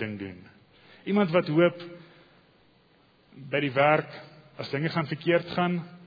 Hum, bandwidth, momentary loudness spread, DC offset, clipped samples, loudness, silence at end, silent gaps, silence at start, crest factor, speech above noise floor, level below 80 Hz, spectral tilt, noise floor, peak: none; 5 kHz; 19 LU; under 0.1%; under 0.1%; -26 LUFS; 0 s; none; 0 s; 20 dB; 35 dB; -70 dBFS; -8.5 dB/octave; -62 dBFS; -8 dBFS